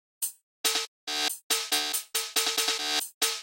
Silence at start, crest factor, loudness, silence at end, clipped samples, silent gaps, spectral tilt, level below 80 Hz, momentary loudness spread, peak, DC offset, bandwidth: 0.2 s; 20 dB; -27 LUFS; 0 s; under 0.1%; 0.43-0.64 s, 0.88-1.07 s, 1.43-1.50 s, 3.14-3.21 s; 3 dB/octave; -76 dBFS; 7 LU; -10 dBFS; under 0.1%; 17 kHz